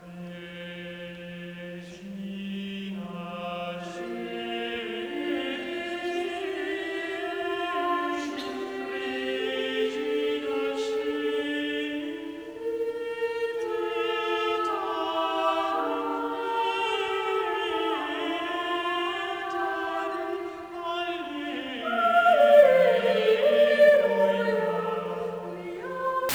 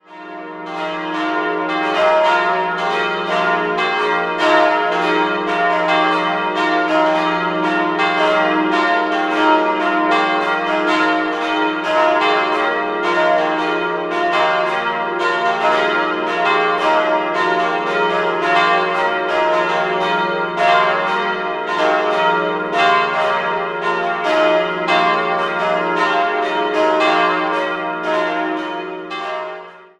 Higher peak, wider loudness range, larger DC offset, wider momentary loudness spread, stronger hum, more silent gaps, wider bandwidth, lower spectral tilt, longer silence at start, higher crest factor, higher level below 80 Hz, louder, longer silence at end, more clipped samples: second, -6 dBFS vs -2 dBFS; first, 13 LU vs 1 LU; neither; first, 15 LU vs 6 LU; neither; neither; first, over 20 kHz vs 11 kHz; about the same, -4.5 dB/octave vs -4.5 dB/octave; about the same, 0 s vs 0.1 s; about the same, 20 dB vs 16 dB; second, -66 dBFS vs -60 dBFS; second, -27 LUFS vs -16 LUFS; second, 0 s vs 0.15 s; neither